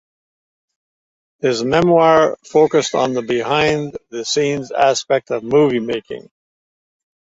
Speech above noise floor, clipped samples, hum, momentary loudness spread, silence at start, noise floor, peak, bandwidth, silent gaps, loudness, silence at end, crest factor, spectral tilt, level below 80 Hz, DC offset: over 74 dB; under 0.1%; none; 12 LU; 1.45 s; under -90 dBFS; -2 dBFS; 8 kHz; none; -16 LUFS; 1.2 s; 16 dB; -4.5 dB/octave; -54 dBFS; under 0.1%